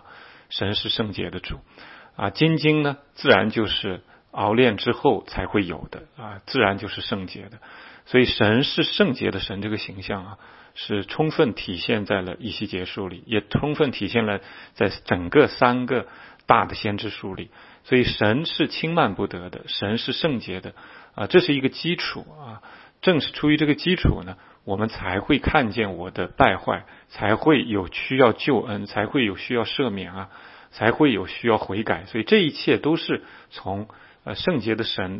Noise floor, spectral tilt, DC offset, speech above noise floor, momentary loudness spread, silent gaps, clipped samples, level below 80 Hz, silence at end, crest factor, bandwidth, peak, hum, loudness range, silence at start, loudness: -47 dBFS; -9.5 dB/octave; under 0.1%; 24 dB; 18 LU; none; under 0.1%; -44 dBFS; 0 s; 24 dB; 5.8 kHz; 0 dBFS; none; 4 LU; 0.1 s; -22 LUFS